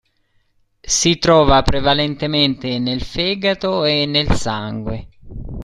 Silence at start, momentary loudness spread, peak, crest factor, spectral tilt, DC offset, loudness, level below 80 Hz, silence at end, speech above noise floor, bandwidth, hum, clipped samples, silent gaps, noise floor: 0.85 s; 14 LU; 0 dBFS; 18 dB; -4 dB/octave; under 0.1%; -16 LUFS; -30 dBFS; 0 s; 45 dB; 12.5 kHz; none; under 0.1%; none; -61 dBFS